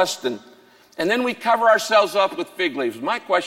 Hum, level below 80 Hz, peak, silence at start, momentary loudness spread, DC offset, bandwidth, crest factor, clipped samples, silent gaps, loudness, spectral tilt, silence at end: none; -68 dBFS; -4 dBFS; 0 s; 11 LU; under 0.1%; 16.5 kHz; 16 dB; under 0.1%; none; -20 LUFS; -3 dB/octave; 0 s